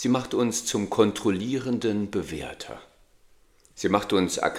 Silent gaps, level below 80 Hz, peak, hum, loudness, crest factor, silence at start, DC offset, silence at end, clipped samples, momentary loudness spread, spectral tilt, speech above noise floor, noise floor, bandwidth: none; -56 dBFS; -4 dBFS; none; -26 LUFS; 22 dB; 0 s; under 0.1%; 0 s; under 0.1%; 13 LU; -4.5 dB/octave; 33 dB; -58 dBFS; 16 kHz